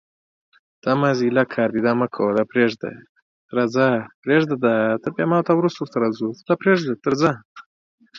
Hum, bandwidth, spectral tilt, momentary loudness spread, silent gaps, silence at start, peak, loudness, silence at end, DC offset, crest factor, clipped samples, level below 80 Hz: none; 7.4 kHz; -7 dB/octave; 6 LU; 3.09-3.15 s, 3.22-3.49 s, 4.14-4.23 s, 7.45-7.55 s, 7.66-7.98 s; 0.85 s; -2 dBFS; -20 LUFS; 0 s; under 0.1%; 18 dB; under 0.1%; -64 dBFS